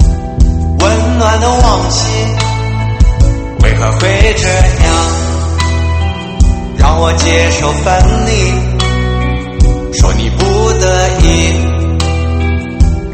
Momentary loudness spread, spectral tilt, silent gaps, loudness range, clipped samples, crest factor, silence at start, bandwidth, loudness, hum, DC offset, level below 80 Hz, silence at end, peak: 4 LU; -5 dB/octave; none; 1 LU; 0.7%; 10 dB; 0 s; 8.8 kHz; -11 LUFS; none; under 0.1%; -12 dBFS; 0 s; 0 dBFS